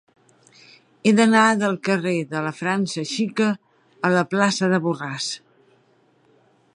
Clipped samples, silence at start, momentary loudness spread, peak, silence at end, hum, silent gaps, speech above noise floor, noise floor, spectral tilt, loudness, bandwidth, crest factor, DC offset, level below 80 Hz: under 0.1%; 1.05 s; 11 LU; -4 dBFS; 1.4 s; none; none; 40 dB; -60 dBFS; -5 dB/octave; -21 LUFS; 11 kHz; 20 dB; under 0.1%; -70 dBFS